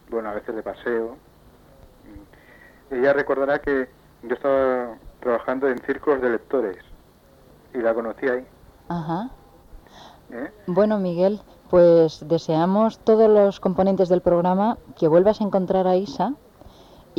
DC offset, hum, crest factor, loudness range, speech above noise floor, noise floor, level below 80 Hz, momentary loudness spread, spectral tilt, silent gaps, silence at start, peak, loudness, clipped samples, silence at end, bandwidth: under 0.1%; none; 16 dB; 9 LU; 32 dB; -52 dBFS; -52 dBFS; 15 LU; -8 dB/octave; none; 0.1 s; -6 dBFS; -21 LUFS; under 0.1%; 0.85 s; 7.4 kHz